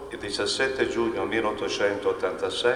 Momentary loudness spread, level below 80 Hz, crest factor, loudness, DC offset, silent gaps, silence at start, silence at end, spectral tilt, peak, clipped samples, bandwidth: 3 LU; -54 dBFS; 18 dB; -26 LUFS; under 0.1%; none; 0 s; 0 s; -3.5 dB/octave; -8 dBFS; under 0.1%; 12 kHz